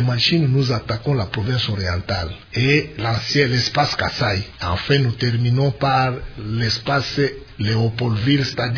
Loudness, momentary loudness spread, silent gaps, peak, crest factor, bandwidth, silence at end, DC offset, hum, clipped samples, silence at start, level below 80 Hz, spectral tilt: -19 LUFS; 6 LU; none; -2 dBFS; 16 dB; 5.4 kHz; 0 s; under 0.1%; none; under 0.1%; 0 s; -40 dBFS; -6 dB/octave